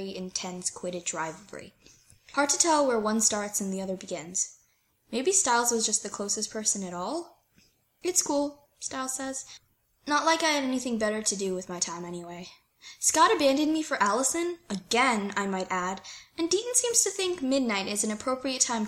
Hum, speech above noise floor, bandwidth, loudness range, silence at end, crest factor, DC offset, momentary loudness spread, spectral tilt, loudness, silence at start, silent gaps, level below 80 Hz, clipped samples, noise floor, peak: none; 40 dB; 16.5 kHz; 4 LU; 0 s; 22 dB; under 0.1%; 14 LU; -2 dB/octave; -27 LUFS; 0 s; none; -66 dBFS; under 0.1%; -68 dBFS; -8 dBFS